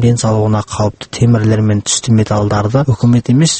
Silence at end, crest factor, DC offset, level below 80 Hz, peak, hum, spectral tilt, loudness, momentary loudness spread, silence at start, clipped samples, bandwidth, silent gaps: 0 s; 12 dB; under 0.1%; -38 dBFS; 0 dBFS; none; -5.5 dB/octave; -13 LUFS; 4 LU; 0 s; under 0.1%; 8.8 kHz; none